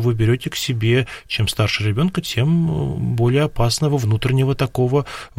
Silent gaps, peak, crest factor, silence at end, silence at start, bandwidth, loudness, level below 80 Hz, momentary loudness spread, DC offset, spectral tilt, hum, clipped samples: none; -6 dBFS; 12 dB; 0.1 s; 0 s; 16.5 kHz; -19 LUFS; -38 dBFS; 4 LU; 0.1%; -6 dB/octave; none; under 0.1%